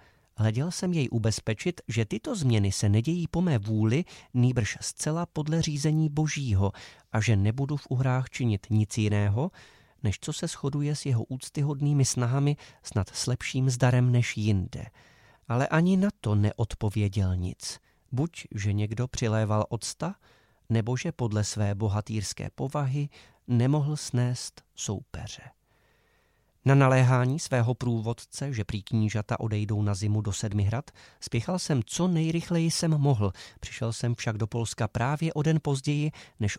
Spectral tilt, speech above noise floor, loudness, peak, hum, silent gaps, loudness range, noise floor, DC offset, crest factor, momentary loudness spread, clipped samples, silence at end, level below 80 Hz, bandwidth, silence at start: -6 dB/octave; 40 dB; -28 LUFS; -8 dBFS; none; none; 4 LU; -67 dBFS; under 0.1%; 20 dB; 9 LU; under 0.1%; 0 s; -54 dBFS; 14 kHz; 0.4 s